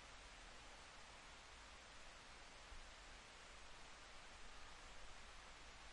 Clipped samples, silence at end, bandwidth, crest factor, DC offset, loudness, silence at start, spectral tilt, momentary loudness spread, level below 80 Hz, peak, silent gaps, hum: under 0.1%; 0 s; 11 kHz; 14 dB; under 0.1%; -60 LUFS; 0 s; -2 dB/octave; 0 LU; -66 dBFS; -46 dBFS; none; none